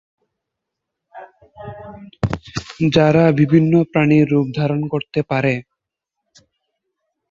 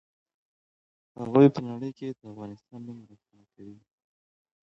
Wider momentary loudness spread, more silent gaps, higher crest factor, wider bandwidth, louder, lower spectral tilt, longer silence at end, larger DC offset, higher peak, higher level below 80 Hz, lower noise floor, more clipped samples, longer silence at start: second, 21 LU vs 24 LU; neither; second, 18 dB vs 24 dB; first, 7.4 kHz vs 6.4 kHz; first, -16 LUFS vs -24 LUFS; second, -8 dB/octave vs -9.5 dB/octave; first, 1.7 s vs 0.95 s; neither; first, -2 dBFS vs -6 dBFS; first, -46 dBFS vs -70 dBFS; second, -81 dBFS vs under -90 dBFS; neither; about the same, 1.15 s vs 1.2 s